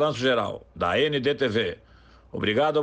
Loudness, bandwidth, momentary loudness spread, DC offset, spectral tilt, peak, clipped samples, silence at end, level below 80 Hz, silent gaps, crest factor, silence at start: -25 LUFS; 9 kHz; 10 LU; under 0.1%; -5.5 dB/octave; -12 dBFS; under 0.1%; 0 s; -54 dBFS; none; 12 dB; 0 s